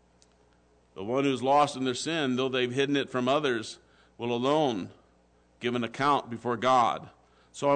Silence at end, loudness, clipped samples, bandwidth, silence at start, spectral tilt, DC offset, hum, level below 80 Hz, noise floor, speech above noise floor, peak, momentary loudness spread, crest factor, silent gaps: 0 s; -28 LUFS; under 0.1%; 9.4 kHz; 0.95 s; -5 dB/octave; under 0.1%; 60 Hz at -60 dBFS; -68 dBFS; -64 dBFS; 36 dB; -14 dBFS; 13 LU; 16 dB; none